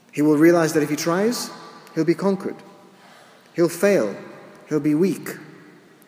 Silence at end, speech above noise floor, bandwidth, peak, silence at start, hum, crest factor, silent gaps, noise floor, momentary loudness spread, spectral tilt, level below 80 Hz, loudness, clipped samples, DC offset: 0.55 s; 29 dB; 16 kHz; -4 dBFS; 0.15 s; none; 18 dB; none; -49 dBFS; 20 LU; -5.5 dB/octave; -76 dBFS; -20 LUFS; under 0.1%; under 0.1%